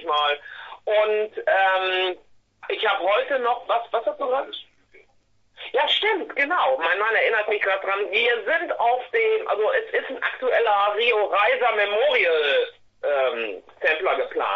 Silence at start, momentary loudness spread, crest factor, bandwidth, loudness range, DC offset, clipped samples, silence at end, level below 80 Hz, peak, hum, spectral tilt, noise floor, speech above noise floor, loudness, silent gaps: 0 s; 8 LU; 16 dB; 7 kHz; 4 LU; under 0.1%; under 0.1%; 0 s; -68 dBFS; -6 dBFS; none; -3 dB/octave; -61 dBFS; 39 dB; -22 LUFS; none